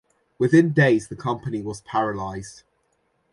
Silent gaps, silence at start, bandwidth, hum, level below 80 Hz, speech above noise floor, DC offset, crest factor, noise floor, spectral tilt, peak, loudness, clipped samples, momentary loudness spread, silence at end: none; 0.4 s; 11.5 kHz; none; -56 dBFS; 47 dB; under 0.1%; 18 dB; -69 dBFS; -7 dB/octave; -6 dBFS; -22 LUFS; under 0.1%; 15 LU; 0.8 s